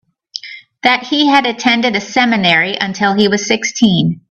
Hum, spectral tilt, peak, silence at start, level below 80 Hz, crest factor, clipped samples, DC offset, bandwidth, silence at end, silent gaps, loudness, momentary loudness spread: none; -4 dB/octave; 0 dBFS; 0.35 s; -54 dBFS; 14 dB; under 0.1%; under 0.1%; 8.4 kHz; 0.1 s; none; -12 LUFS; 16 LU